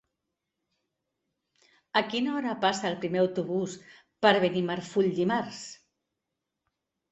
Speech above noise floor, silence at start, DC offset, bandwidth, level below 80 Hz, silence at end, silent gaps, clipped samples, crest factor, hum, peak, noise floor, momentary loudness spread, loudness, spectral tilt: 58 dB; 1.95 s; under 0.1%; 8.4 kHz; -72 dBFS; 1.35 s; none; under 0.1%; 24 dB; none; -6 dBFS; -85 dBFS; 13 LU; -28 LUFS; -5 dB/octave